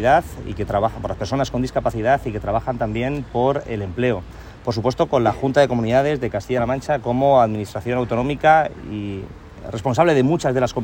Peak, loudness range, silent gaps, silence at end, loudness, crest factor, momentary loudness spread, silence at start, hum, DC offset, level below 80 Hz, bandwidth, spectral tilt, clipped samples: -2 dBFS; 3 LU; none; 0 s; -20 LUFS; 18 dB; 12 LU; 0 s; none; under 0.1%; -40 dBFS; 16.5 kHz; -6.5 dB/octave; under 0.1%